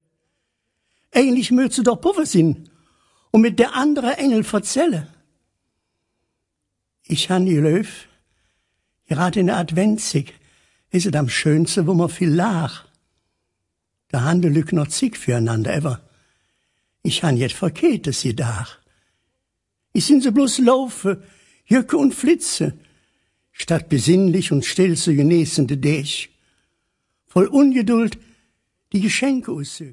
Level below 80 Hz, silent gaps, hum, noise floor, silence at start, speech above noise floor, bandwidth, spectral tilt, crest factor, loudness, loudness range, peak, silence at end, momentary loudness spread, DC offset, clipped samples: -56 dBFS; none; none; -78 dBFS; 1.15 s; 60 dB; 11.5 kHz; -5.5 dB/octave; 18 dB; -19 LUFS; 5 LU; -2 dBFS; 0 s; 10 LU; under 0.1%; under 0.1%